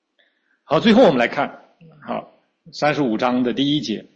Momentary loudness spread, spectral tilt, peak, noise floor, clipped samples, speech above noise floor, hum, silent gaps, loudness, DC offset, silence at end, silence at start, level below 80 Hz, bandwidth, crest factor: 17 LU; -6 dB/octave; -4 dBFS; -64 dBFS; under 0.1%; 46 dB; none; none; -18 LUFS; under 0.1%; 0.15 s; 0.7 s; -58 dBFS; 8 kHz; 16 dB